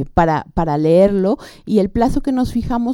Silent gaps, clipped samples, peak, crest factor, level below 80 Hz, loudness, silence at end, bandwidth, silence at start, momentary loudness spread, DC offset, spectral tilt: none; under 0.1%; 0 dBFS; 16 dB; -30 dBFS; -16 LUFS; 0 s; 16.5 kHz; 0 s; 7 LU; under 0.1%; -8 dB/octave